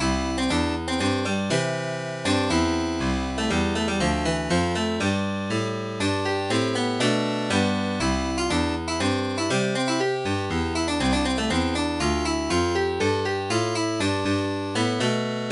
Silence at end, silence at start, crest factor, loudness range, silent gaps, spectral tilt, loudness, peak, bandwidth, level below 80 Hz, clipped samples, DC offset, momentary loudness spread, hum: 0 s; 0 s; 14 dB; 1 LU; none; -4.5 dB/octave; -24 LUFS; -10 dBFS; 11.5 kHz; -38 dBFS; under 0.1%; under 0.1%; 3 LU; none